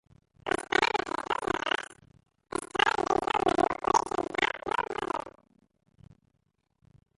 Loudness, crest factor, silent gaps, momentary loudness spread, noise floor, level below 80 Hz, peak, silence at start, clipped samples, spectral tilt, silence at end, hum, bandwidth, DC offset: -29 LUFS; 22 dB; none; 11 LU; -76 dBFS; -58 dBFS; -10 dBFS; 0.45 s; under 0.1%; -3 dB/octave; 1.9 s; none; 11.5 kHz; under 0.1%